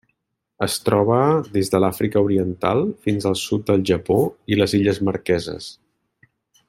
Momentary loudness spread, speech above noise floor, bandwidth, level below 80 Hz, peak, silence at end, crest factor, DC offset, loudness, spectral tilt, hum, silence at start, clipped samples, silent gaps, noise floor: 5 LU; 53 dB; 16.5 kHz; -54 dBFS; -4 dBFS; 0.95 s; 18 dB; under 0.1%; -20 LUFS; -6 dB/octave; none; 0.6 s; under 0.1%; none; -72 dBFS